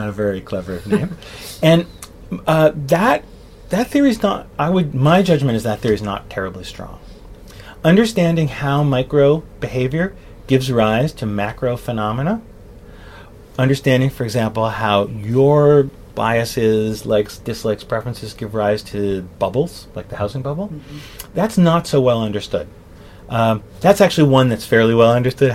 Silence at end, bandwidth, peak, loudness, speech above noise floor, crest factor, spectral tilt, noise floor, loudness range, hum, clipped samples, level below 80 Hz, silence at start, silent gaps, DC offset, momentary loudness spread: 0 s; 16 kHz; 0 dBFS; -17 LUFS; 23 dB; 16 dB; -6.5 dB/octave; -39 dBFS; 5 LU; none; under 0.1%; -42 dBFS; 0 s; none; under 0.1%; 13 LU